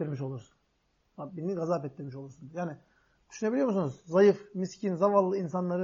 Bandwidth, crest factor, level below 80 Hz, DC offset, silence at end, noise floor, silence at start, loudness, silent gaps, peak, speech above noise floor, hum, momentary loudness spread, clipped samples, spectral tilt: 7.4 kHz; 20 dB; -74 dBFS; under 0.1%; 0 s; -73 dBFS; 0 s; -30 LUFS; none; -10 dBFS; 44 dB; none; 19 LU; under 0.1%; -7.5 dB/octave